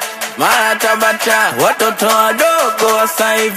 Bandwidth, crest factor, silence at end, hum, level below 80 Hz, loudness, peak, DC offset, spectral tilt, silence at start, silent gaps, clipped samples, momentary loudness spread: 15.5 kHz; 12 dB; 0 s; none; -60 dBFS; -12 LUFS; 0 dBFS; under 0.1%; -1.5 dB/octave; 0 s; none; under 0.1%; 2 LU